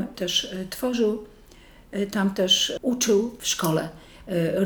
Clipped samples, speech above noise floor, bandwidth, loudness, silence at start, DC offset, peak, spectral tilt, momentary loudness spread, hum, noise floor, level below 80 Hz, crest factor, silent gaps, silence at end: under 0.1%; 25 dB; over 20 kHz; -24 LUFS; 0 s; under 0.1%; -8 dBFS; -3.5 dB/octave; 11 LU; none; -50 dBFS; -54 dBFS; 18 dB; none; 0 s